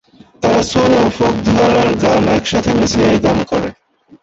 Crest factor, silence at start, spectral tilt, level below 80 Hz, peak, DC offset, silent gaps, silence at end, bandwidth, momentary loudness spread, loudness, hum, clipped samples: 12 dB; 0.4 s; -5.5 dB/octave; -36 dBFS; -2 dBFS; under 0.1%; none; 0.5 s; 8.2 kHz; 6 LU; -13 LUFS; none; under 0.1%